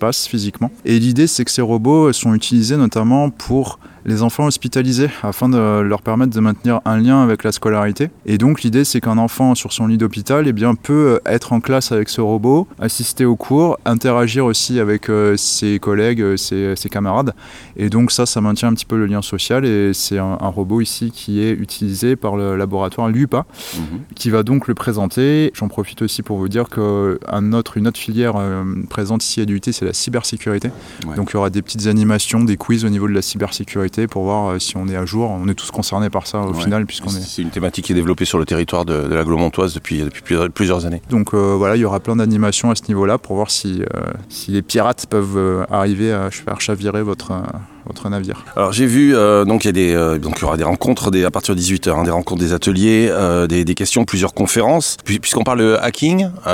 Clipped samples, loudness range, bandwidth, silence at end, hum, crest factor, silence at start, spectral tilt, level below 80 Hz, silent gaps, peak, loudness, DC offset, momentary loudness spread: under 0.1%; 4 LU; 17 kHz; 0 s; none; 14 dB; 0 s; -5 dB/octave; -40 dBFS; none; -2 dBFS; -16 LUFS; under 0.1%; 8 LU